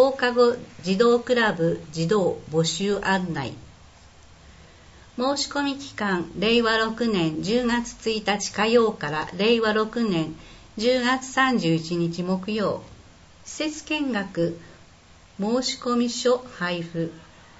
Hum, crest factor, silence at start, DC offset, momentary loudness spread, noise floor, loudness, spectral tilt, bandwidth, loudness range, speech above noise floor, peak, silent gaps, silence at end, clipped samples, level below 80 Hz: none; 18 dB; 0 s; under 0.1%; 10 LU; -51 dBFS; -24 LUFS; -4.5 dB/octave; 8 kHz; 6 LU; 28 dB; -6 dBFS; none; 0.35 s; under 0.1%; -54 dBFS